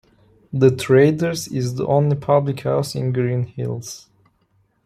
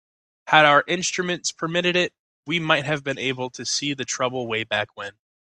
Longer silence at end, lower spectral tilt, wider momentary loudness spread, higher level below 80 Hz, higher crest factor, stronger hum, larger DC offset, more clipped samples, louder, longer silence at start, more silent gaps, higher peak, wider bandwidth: first, 0.9 s vs 0.5 s; first, -6.5 dB/octave vs -3 dB/octave; about the same, 13 LU vs 11 LU; first, -56 dBFS vs -64 dBFS; about the same, 18 dB vs 22 dB; neither; neither; neither; first, -19 LUFS vs -22 LUFS; about the same, 0.55 s vs 0.45 s; second, none vs 2.19-2.43 s; about the same, -2 dBFS vs -2 dBFS; first, 15.5 kHz vs 11 kHz